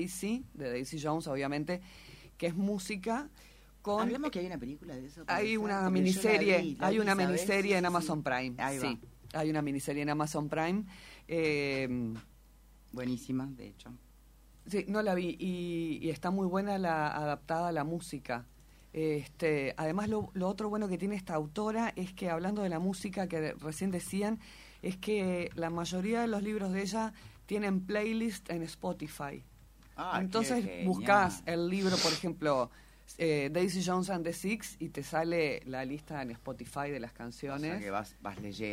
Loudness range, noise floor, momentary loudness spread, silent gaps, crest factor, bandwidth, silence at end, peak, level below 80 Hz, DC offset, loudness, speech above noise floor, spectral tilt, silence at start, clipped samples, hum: 6 LU; -59 dBFS; 13 LU; none; 22 dB; 16 kHz; 0 s; -12 dBFS; -60 dBFS; under 0.1%; -34 LUFS; 25 dB; -5.5 dB/octave; 0 s; under 0.1%; none